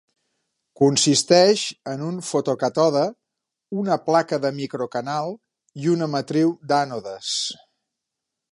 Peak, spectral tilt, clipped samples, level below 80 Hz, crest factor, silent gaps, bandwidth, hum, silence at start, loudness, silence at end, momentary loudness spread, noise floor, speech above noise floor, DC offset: -2 dBFS; -4 dB/octave; under 0.1%; -70 dBFS; 20 dB; none; 11.5 kHz; none; 0.8 s; -21 LUFS; 1 s; 13 LU; -83 dBFS; 62 dB; under 0.1%